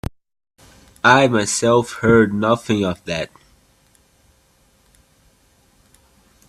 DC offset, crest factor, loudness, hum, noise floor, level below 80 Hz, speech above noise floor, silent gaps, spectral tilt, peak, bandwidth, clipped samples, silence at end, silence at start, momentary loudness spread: under 0.1%; 20 dB; -17 LUFS; none; -57 dBFS; -48 dBFS; 41 dB; none; -4.5 dB/octave; 0 dBFS; 13.5 kHz; under 0.1%; 3.25 s; 1.05 s; 13 LU